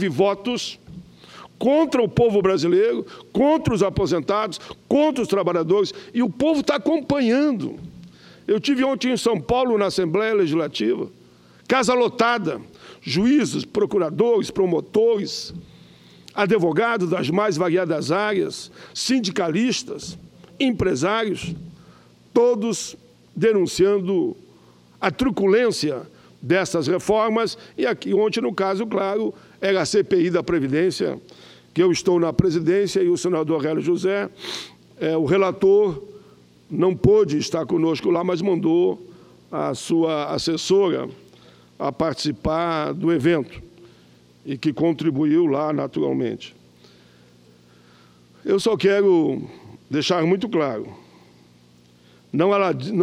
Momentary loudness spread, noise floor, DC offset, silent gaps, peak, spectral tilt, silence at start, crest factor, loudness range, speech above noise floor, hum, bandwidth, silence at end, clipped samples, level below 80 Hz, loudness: 12 LU; -53 dBFS; under 0.1%; none; 0 dBFS; -5.5 dB/octave; 0 s; 20 dB; 3 LU; 33 dB; none; 13 kHz; 0 s; under 0.1%; -50 dBFS; -21 LUFS